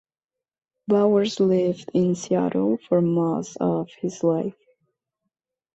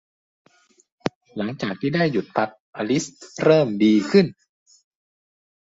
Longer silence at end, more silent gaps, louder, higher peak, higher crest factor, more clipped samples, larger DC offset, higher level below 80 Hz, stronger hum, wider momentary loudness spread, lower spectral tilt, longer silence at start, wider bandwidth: about the same, 1.25 s vs 1.35 s; second, none vs 1.15-1.21 s, 2.60-2.73 s; about the same, -23 LUFS vs -21 LUFS; second, -8 dBFS vs -2 dBFS; about the same, 16 dB vs 20 dB; neither; neither; about the same, -66 dBFS vs -64 dBFS; neither; second, 7 LU vs 14 LU; about the same, -7 dB/octave vs -6 dB/octave; second, 0.9 s vs 1.05 s; about the same, 8.2 kHz vs 8 kHz